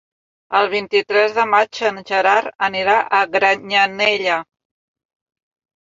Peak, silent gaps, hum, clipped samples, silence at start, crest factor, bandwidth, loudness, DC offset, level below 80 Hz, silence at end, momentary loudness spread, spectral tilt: 0 dBFS; 2.55-2.59 s; none; under 0.1%; 0.5 s; 18 dB; 7.8 kHz; -16 LUFS; under 0.1%; -62 dBFS; 1.45 s; 5 LU; -3 dB/octave